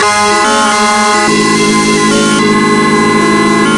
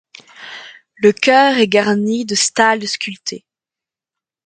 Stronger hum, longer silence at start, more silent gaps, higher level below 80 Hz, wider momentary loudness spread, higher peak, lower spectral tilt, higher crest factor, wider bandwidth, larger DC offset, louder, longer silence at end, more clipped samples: neither; second, 0 s vs 0.4 s; neither; first, -40 dBFS vs -64 dBFS; second, 0 LU vs 22 LU; about the same, 0 dBFS vs 0 dBFS; about the same, -3.5 dB/octave vs -3 dB/octave; second, 8 dB vs 16 dB; first, 11.5 kHz vs 9.4 kHz; first, 0.2% vs under 0.1%; first, -8 LUFS vs -14 LUFS; second, 0 s vs 1.1 s; neither